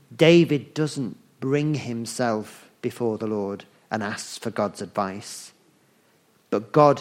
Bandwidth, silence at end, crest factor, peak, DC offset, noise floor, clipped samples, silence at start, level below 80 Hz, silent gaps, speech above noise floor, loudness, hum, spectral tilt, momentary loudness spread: 15.5 kHz; 0 s; 20 dB; -4 dBFS; under 0.1%; -62 dBFS; under 0.1%; 0.1 s; -68 dBFS; none; 39 dB; -24 LUFS; none; -6 dB/octave; 16 LU